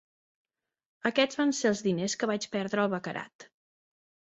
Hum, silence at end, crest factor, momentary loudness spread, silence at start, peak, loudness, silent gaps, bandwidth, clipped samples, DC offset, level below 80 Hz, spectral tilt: none; 0.9 s; 20 dB; 10 LU; 1.05 s; -10 dBFS; -29 LUFS; 3.35-3.39 s; 8.2 kHz; under 0.1%; under 0.1%; -74 dBFS; -4 dB/octave